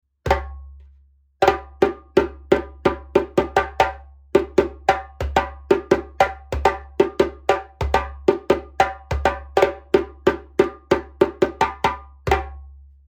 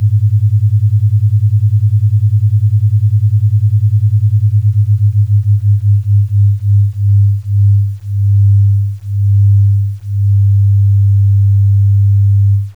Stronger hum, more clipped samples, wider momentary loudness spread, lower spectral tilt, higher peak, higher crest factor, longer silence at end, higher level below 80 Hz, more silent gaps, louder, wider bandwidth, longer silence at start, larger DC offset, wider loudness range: neither; neither; about the same, 4 LU vs 3 LU; second, -6 dB/octave vs -9.5 dB/octave; first, 0 dBFS vs -4 dBFS; first, 20 dB vs 6 dB; first, 0.4 s vs 0.05 s; first, -36 dBFS vs -44 dBFS; neither; second, -21 LUFS vs -11 LUFS; first, 18.5 kHz vs 0.2 kHz; first, 0.25 s vs 0 s; second, under 0.1% vs 0.4%; about the same, 1 LU vs 1 LU